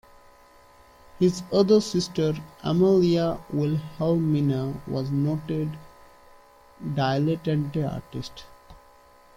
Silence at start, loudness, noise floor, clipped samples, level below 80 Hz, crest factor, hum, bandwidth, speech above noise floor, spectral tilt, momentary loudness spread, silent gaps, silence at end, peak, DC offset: 1.15 s; -25 LUFS; -54 dBFS; under 0.1%; -54 dBFS; 18 dB; none; 15.5 kHz; 30 dB; -7 dB/octave; 14 LU; none; 0.6 s; -8 dBFS; under 0.1%